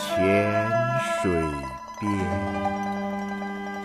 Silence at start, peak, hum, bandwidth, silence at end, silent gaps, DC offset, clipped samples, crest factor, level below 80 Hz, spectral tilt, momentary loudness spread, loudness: 0 s; -10 dBFS; 50 Hz at -40 dBFS; 15.5 kHz; 0 s; none; under 0.1%; under 0.1%; 16 dB; -48 dBFS; -6 dB/octave; 10 LU; -26 LUFS